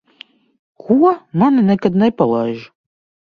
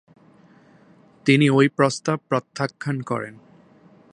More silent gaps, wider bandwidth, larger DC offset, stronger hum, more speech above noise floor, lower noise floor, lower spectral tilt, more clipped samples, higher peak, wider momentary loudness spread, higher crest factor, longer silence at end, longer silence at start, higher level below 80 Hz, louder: neither; second, 6.4 kHz vs 10.5 kHz; neither; neither; about the same, 31 dB vs 32 dB; second, -45 dBFS vs -53 dBFS; first, -9.5 dB/octave vs -6 dB/octave; neither; about the same, 0 dBFS vs -2 dBFS; second, 7 LU vs 12 LU; second, 16 dB vs 22 dB; second, 0.65 s vs 0.8 s; second, 0.85 s vs 1.25 s; first, -56 dBFS vs -68 dBFS; first, -15 LUFS vs -21 LUFS